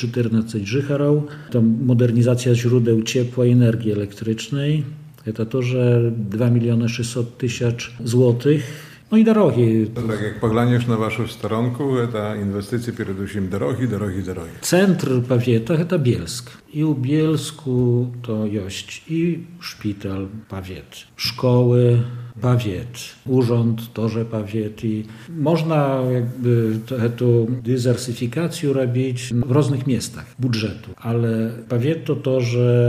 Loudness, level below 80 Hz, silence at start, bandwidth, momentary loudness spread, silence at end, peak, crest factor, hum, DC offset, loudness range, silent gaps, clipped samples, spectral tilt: -20 LUFS; -54 dBFS; 0 s; 15 kHz; 11 LU; 0 s; -2 dBFS; 16 dB; none; under 0.1%; 4 LU; none; under 0.1%; -7 dB/octave